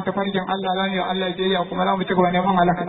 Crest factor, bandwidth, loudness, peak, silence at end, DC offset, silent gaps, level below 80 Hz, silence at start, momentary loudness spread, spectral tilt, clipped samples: 14 dB; 4.1 kHz; -21 LUFS; -6 dBFS; 0 s; under 0.1%; none; -52 dBFS; 0 s; 5 LU; -10 dB/octave; under 0.1%